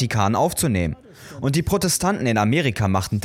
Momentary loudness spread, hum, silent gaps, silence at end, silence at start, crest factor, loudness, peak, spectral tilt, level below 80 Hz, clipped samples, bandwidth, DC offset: 8 LU; none; none; 0 s; 0 s; 14 dB; -21 LUFS; -6 dBFS; -5 dB/octave; -42 dBFS; under 0.1%; 17 kHz; under 0.1%